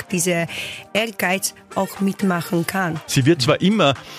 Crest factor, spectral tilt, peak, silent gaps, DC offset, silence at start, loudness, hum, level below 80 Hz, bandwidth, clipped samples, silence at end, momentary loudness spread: 16 dB; -4.5 dB/octave; -4 dBFS; none; under 0.1%; 0 s; -20 LUFS; none; -54 dBFS; 15.5 kHz; under 0.1%; 0 s; 8 LU